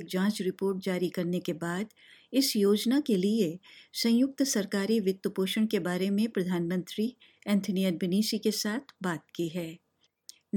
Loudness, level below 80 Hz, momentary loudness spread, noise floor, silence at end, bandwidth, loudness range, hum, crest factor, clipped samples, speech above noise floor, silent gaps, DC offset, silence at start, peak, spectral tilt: -29 LUFS; -78 dBFS; 9 LU; -56 dBFS; 0 s; 17.5 kHz; 3 LU; none; 16 dB; under 0.1%; 27 dB; none; under 0.1%; 0 s; -14 dBFS; -5 dB/octave